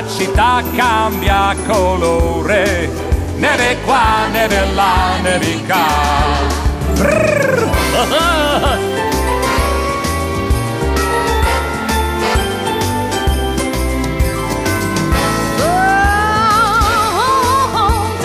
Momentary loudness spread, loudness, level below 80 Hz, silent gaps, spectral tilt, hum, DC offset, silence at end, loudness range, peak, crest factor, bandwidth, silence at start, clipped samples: 5 LU; -14 LUFS; -22 dBFS; none; -4.5 dB/octave; none; under 0.1%; 0 s; 3 LU; -4 dBFS; 10 dB; 15.5 kHz; 0 s; under 0.1%